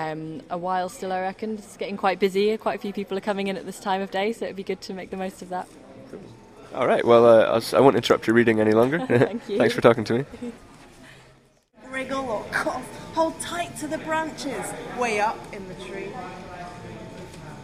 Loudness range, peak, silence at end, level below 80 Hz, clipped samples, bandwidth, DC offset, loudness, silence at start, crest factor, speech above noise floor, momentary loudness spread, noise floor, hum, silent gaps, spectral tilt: 11 LU; -2 dBFS; 0 s; -56 dBFS; under 0.1%; 15.5 kHz; under 0.1%; -23 LUFS; 0 s; 22 dB; 34 dB; 20 LU; -57 dBFS; none; none; -5.5 dB/octave